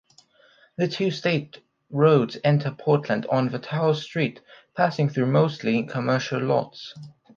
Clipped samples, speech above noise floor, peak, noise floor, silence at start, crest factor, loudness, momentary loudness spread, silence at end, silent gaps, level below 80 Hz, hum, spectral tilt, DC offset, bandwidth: under 0.1%; 35 dB; -4 dBFS; -58 dBFS; 0.8 s; 20 dB; -23 LUFS; 15 LU; 0.25 s; none; -68 dBFS; none; -7 dB/octave; under 0.1%; 7.2 kHz